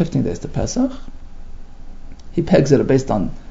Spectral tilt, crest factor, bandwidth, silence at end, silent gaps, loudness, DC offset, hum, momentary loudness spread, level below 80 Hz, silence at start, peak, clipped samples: -7 dB/octave; 18 dB; 7.8 kHz; 0 s; none; -18 LUFS; under 0.1%; none; 10 LU; -32 dBFS; 0 s; 0 dBFS; under 0.1%